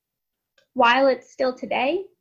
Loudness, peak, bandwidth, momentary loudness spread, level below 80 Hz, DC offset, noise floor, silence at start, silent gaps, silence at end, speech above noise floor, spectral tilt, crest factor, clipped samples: -21 LUFS; -6 dBFS; 7.4 kHz; 9 LU; -66 dBFS; under 0.1%; -82 dBFS; 0.75 s; none; 0.15 s; 61 dB; -4 dB/octave; 18 dB; under 0.1%